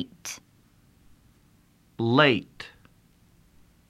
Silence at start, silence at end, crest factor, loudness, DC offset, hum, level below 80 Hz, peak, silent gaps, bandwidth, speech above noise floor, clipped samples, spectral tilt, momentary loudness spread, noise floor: 0 s; 1.2 s; 24 dB; -24 LUFS; under 0.1%; none; -64 dBFS; -4 dBFS; none; 15.5 kHz; 36 dB; under 0.1%; -5 dB/octave; 24 LU; -61 dBFS